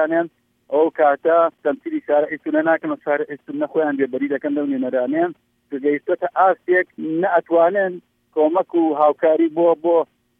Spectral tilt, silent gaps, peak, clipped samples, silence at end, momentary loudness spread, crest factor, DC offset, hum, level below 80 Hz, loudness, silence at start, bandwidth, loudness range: -9 dB/octave; none; -4 dBFS; under 0.1%; 0.35 s; 8 LU; 14 dB; under 0.1%; none; -76 dBFS; -19 LUFS; 0 s; 3.7 kHz; 4 LU